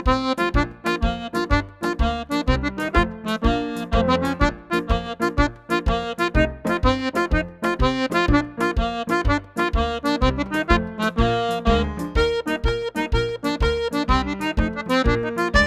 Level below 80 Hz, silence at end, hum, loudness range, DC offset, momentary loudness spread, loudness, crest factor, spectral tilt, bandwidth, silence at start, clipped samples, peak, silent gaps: -28 dBFS; 0 s; none; 1 LU; under 0.1%; 4 LU; -22 LUFS; 20 dB; -6 dB/octave; 14.5 kHz; 0 s; under 0.1%; 0 dBFS; none